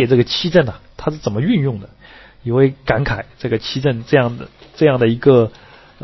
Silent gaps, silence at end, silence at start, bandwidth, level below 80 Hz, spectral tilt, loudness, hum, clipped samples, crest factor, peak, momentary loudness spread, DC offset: none; 0.55 s; 0 s; 6.2 kHz; -42 dBFS; -7.5 dB/octave; -17 LUFS; none; under 0.1%; 16 dB; 0 dBFS; 11 LU; under 0.1%